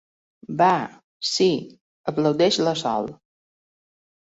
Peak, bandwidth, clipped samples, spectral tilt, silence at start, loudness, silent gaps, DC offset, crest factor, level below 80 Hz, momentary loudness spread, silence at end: -6 dBFS; 8 kHz; under 0.1%; -4.5 dB/octave; 0.5 s; -22 LUFS; 1.04-1.20 s, 1.81-2.04 s; under 0.1%; 18 dB; -64 dBFS; 13 LU; 1.15 s